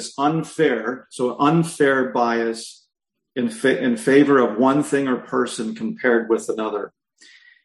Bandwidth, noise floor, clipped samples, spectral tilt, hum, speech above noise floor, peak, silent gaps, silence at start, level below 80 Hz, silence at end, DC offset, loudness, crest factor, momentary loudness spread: 12.5 kHz; -51 dBFS; under 0.1%; -5.5 dB/octave; none; 32 dB; -2 dBFS; none; 0 s; -66 dBFS; 0.75 s; under 0.1%; -20 LUFS; 18 dB; 11 LU